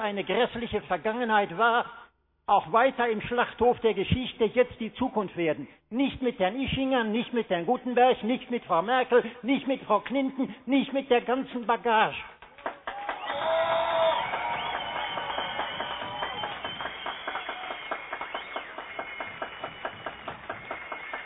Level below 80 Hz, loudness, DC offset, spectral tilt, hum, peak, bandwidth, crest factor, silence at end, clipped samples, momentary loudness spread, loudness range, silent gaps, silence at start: -56 dBFS; -28 LUFS; under 0.1%; -9 dB/octave; none; -8 dBFS; 4.1 kHz; 20 dB; 0 s; under 0.1%; 13 LU; 9 LU; none; 0 s